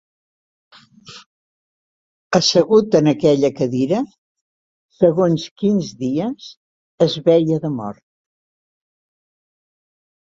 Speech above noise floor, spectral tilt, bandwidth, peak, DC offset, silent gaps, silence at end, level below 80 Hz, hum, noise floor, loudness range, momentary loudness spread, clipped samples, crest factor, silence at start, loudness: 26 dB; -6 dB/octave; 7.8 kHz; -2 dBFS; under 0.1%; 1.26-2.30 s, 4.18-4.35 s, 4.41-4.89 s, 5.51-5.56 s, 6.57-6.98 s; 2.35 s; -60 dBFS; none; -43 dBFS; 5 LU; 11 LU; under 0.1%; 18 dB; 1.1 s; -17 LUFS